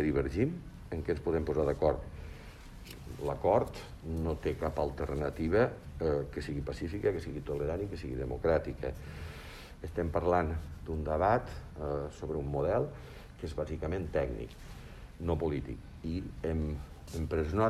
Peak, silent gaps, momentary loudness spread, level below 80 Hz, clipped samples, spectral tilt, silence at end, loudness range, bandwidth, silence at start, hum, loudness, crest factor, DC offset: -14 dBFS; none; 16 LU; -44 dBFS; under 0.1%; -8 dB/octave; 0 s; 4 LU; 14 kHz; 0 s; none; -34 LUFS; 20 dB; under 0.1%